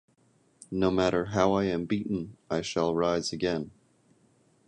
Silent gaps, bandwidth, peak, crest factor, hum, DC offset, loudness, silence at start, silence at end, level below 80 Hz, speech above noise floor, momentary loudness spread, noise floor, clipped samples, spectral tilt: none; 11 kHz; -10 dBFS; 20 dB; none; under 0.1%; -28 LUFS; 0.7 s; 1 s; -54 dBFS; 38 dB; 9 LU; -66 dBFS; under 0.1%; -5.5 dB/octave